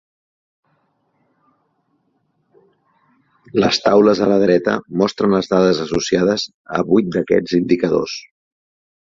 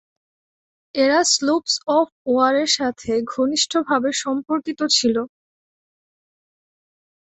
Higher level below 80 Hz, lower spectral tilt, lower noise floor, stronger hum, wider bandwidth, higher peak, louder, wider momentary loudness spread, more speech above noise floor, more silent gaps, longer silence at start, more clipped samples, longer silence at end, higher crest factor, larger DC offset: first, -52 dBFS vs -62 dBFS; first, -5.5 dB/octave vs -1.5 dB/octave; second, -65 dBFS vs under -90 dBFS; neither; second, 7.6 kHz vs 8.4 kHz; about the same, -2 dBFS vs -4 dBFS; first, -16 LUFS vs -19 LUFS; about the same, 9 LU vs 7 LU; second, 50 dB vs over 71 dB; about the same, 6.54-6.65 s vs 2.12-2.25 s; first, 3.55 s vs 0.95 s; neither; second, 0.95 s vs 2.1 s; about the same, 16 dB vs 18 dB; neither